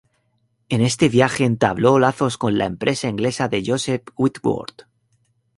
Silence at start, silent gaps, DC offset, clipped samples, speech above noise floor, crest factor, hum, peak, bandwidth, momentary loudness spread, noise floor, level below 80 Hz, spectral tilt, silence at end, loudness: 0.7 s; none; under 0.1%; under 0.1%; 48 dB; 18 dB; none; -2 dBFS; 11.5 kHz; 8 LU; -67 dBFS; -52 dBFS; -5.5 dB/octave; 0.75 s; -19 LUFS